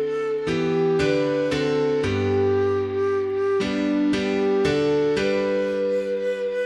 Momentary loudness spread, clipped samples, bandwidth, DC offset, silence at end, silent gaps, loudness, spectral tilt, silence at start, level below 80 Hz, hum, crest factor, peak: 4 LU; under 0.1%; 10.5 kHz; under 0.1%; 0 s; none; -22 LUFS; -6.5 dB/octave; 0 s; -50 dBFS; none; 12 dB; -10 dBFS